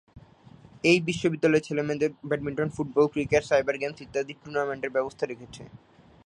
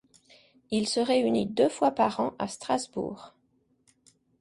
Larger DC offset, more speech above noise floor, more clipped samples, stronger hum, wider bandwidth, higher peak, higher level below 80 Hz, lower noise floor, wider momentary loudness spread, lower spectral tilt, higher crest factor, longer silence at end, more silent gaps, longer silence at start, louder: neither; second, 26 dB vs 43 dB; neither; neither; about the same, 10.5 kHz vs 11.5 kHz; about the same, -8 dBFS vs -10 dBFS; first, -58 dBFS vs -66 dBFS; second, -52 dBFS vs -70 dBFS; about the same, 10 LU vs 11 LU; about the same, -5.5 dB/octave vs -4.5 dB/octave; about the same, 20 dB vs 18 dB; second, 0.5 s vs 1.15 s; neither; second, 0.15 s vs 0.7 s; about the same, -27 LUFS vs -28 LUFS